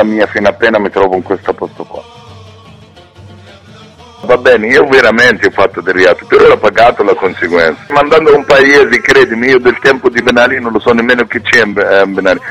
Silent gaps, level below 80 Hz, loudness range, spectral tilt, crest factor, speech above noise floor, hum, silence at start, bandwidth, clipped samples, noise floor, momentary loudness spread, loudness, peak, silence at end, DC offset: none; -40 dBFS; 9 LU; -4.5 dB/octave; 8 dB; 28 dB; none; 0 s; 12 kHz; 2%; -36 dBFS; 7 LU; -8 LUFS; 0 dBFS; 0 s; under 0.1%